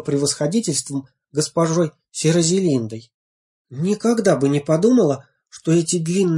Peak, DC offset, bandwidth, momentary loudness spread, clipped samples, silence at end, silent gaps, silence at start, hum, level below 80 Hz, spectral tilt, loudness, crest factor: -2 dBFS; under 0.1%; 11.5 kHz; 12 LU; under 0.1%; 0 s; 3.14-3.65 s; 0 s; none; -62 dBFS; -5.5 dB/octave; -19 LUFS; 16 dB